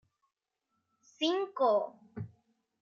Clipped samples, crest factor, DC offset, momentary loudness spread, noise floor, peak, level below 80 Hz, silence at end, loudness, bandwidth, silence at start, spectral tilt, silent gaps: under 0.1%; 18 dB; under 0.1%; 17 LU; -83 dBFS; -18 dBFS; -80 dBFS; 0.55 s; -31 LUFS; 7.2 kHz; 1.2 s; -5.5 dB/octave; none